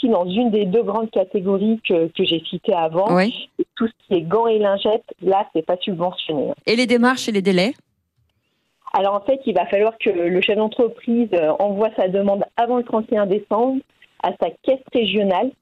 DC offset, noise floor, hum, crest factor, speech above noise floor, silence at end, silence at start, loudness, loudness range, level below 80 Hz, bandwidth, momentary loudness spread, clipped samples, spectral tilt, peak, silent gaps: under 0.1%; -69 dBFS; none; 14 dB; 50 dB; 0.1 s; 0 s; -19 LUFS; 2 LU; -62 dBFS; 12 kHz; 6 LU; under 0.1%; -6 dB/octave; -4 dBFS; none